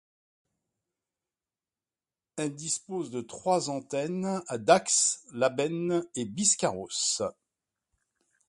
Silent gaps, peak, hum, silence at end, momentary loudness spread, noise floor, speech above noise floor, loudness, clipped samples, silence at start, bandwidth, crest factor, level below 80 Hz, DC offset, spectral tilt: none; -6 dBFS; none; 1.15 s; 11 LU; under -90 dBFS; over 61 dB; -28 LUFS; under 0.1%; 2.35 s; 11.5 kHz; 24 dB; -72 dBFS; under 0.1%; -3 dB/octave